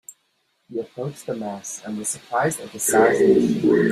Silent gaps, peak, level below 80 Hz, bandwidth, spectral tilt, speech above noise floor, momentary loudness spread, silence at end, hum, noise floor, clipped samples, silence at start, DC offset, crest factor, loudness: none; -4 dBFS; -60 dBFS; 15.5 kHz; -5 dB/octave; 48 dB; 15 LU; 0 s; none; -69 dBFS; under 0.1%; 0.1 s; under 0.1%; 18 dB; -21 LUFS